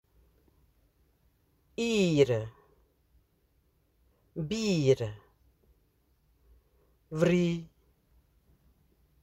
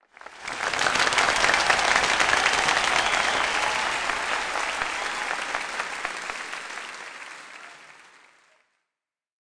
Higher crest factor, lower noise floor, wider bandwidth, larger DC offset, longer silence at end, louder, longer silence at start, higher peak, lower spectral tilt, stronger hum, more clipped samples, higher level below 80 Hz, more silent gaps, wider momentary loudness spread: about the same, 22 dB vs 18 dB; second, -71 dBFS vs -89 dBFS; first, 13 kHz vs 10.5 kHz; neither; about the same, 1.55 s vs 1.6 s; second, -29 LUFS vs -23 LUFS; first, 1.8 s vs 0.25 s; second, -12 dBFS vs -8 dBFS; first, -6 dB/octave vs -0.5 dB/octave; neither; neither; second, -62 dBFS vs -54 dBFS; neither; about the same, 19 LU vs 18 LU